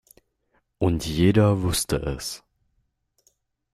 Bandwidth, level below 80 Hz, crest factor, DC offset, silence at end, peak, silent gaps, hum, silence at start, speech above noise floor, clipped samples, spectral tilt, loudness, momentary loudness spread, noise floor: 15.5 kHz; -42 dBFS; 18 dB; under 0.1%; 1.35 s; -6 dBFS; none; none; 0.8 s; 50 dB; under 0.1%; -5.5 dB/octave; -23 LUFS; 14 LU; -72 dBFS